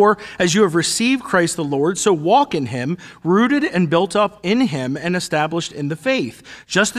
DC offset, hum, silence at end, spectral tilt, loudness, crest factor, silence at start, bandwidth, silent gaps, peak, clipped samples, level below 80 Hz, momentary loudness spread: under 0.1%; none; 0 s; -4.5 dB/octave; -18 LUFS; 16 dB; 0 s; 14.5 kHz; none; -2 dBFS; under 0.1%; -56 dBFS; 8 LU